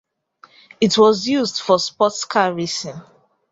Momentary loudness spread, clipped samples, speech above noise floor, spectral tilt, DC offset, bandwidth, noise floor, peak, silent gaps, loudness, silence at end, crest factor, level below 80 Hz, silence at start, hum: 11 LU; under 0.1%; 34 dB; -4 dB/octave; under 0.1%; 7.8 kHz; -51 dBFS; -2 dBFS; none; -18 LUFS; 0.5 s; 18 dB; -62 dBFS; 0.8 s; none